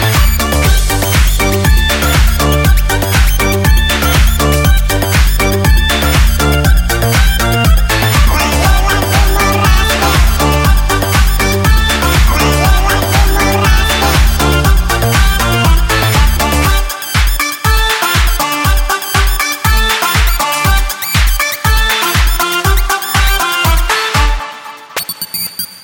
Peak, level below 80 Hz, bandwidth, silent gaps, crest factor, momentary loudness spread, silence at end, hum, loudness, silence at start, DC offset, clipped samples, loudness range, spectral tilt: 0 dBFS; -12 dBFS; 17 kHz; none; 10 dB; 3 LU; 0.05 s; none; -11 LUFS; 0 s; under 0.1%; under 0.1%; 1 LU; -4 dB/octave